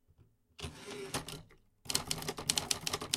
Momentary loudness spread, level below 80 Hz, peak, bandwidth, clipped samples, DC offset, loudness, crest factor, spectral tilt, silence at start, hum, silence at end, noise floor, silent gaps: 15 LU; -60 dBFS; -8 dBFS; 16.5 kHz; under 0.1%; under 0.1%; -36 LUFS; 32 dB; -1.5 dB/octave; 0.2 s; none; 0 s; -67 dBFS; none